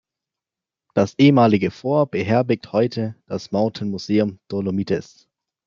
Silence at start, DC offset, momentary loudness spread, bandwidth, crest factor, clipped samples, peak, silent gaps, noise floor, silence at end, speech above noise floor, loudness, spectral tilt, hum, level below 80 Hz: 0.95 s; under 0.1%; 11 LU; 7.4 kHz; 18 dB; under 0.1%; -2 dBFS; none; -88 dBFS; 0.65 s; 69 dB; -20 LUFS; -7.5 dB/octave; none; -62 dBFS